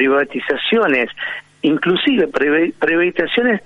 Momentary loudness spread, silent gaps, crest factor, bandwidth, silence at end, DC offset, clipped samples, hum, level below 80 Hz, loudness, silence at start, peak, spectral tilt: 6 LU; none; 14 dB; 7.8 kHz; 0.05 s; under 0.1%; under 0.1%; none; -54 dBFS; -16 LUFS; 0 s; -2 dBFS; -6.5 dB/octave